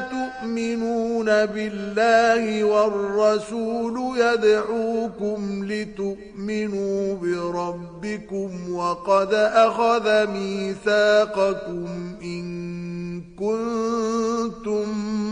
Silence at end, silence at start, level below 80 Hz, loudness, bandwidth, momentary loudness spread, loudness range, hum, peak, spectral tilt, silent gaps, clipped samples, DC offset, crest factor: 0 s; 0 s; -54 dBFS; -23 LUFS; 10.5 kHz; 13 LU; 7 LU; none; -6 dBFS; -5.5 dB/octave; none; under 0.1%; under 0.1%; 16 dB